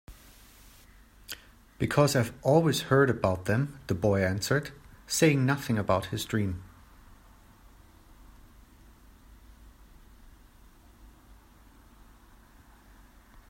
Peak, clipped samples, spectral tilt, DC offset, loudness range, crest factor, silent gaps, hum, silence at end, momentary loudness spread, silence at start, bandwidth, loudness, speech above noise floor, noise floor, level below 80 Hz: -8 dBFS; under 0.1%; -5.5 dB/octave; under 0.1%; 9 LU; 22 dB; none; none; 2.45 s; 16 LU; 0.1 s; 16 kHz; -27 LUFS; 30 dB; -56 dBFS; -54 dBFS